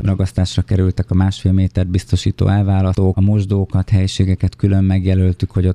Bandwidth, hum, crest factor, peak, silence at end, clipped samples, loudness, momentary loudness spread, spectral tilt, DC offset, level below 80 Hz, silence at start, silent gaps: 10 kHz; none; 14 dB; -2 dBFS; 0 s; under 0.1%; -16 LUFS; 3 LU; -7.5 dB/octave; under 0.1%; -36 dBFS; 0 s; none